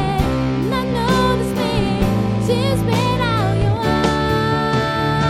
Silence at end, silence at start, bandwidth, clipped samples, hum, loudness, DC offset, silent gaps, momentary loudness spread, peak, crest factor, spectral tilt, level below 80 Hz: 0 s; 0 s; 15 kHz; under 0.1%; none; -18 LUFS; under 0.1%; none; 2 LU; -4 dBFS; 14 dB; -6.5 dB/octave; -30 dBFS